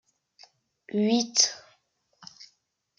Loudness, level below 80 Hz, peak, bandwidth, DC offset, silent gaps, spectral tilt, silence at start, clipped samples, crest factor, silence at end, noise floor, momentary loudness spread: -24 LUFS; -80 dBFS; -6 dBFS; 10.5 kHz; under 0.1%; none; -2.5 dB/octave; 0.95 s; under 0.1%; 24 dB; 0.55 s; -72 dBFS; 25 LU